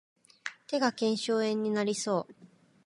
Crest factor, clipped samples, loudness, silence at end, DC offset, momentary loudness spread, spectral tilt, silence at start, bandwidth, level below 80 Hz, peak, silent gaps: 20 dB; under 0.1%; -30 LUFS; 0.4 s; under 0.1%; 14 LU; -4 dB/octave; 0.45 s; 11.5 kHz; -82 dBFS; -12 dBFS; none